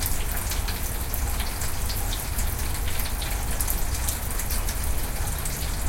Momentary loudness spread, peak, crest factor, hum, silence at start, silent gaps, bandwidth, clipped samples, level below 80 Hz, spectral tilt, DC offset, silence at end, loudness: 2 LU; -4 dBFS; 20 dB; none; 0 s; none; 17 kHz; under 0.1%; -28 dBFS; -3 dB/octave; under 0.1%; 0 s; -28 LUFS